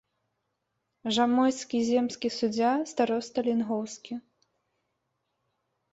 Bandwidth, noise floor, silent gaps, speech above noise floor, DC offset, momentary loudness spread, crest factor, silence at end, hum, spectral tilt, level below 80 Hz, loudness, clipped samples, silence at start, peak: 8 kHz; -80 dBFS; none; 53 dB; under 0.1%; 13 LU; 18 dB; 1.75 s; none; -4 dB/octave; -72 dBFS; -28 LUFS; under 0.1%; 1.05 s; -12 dBFS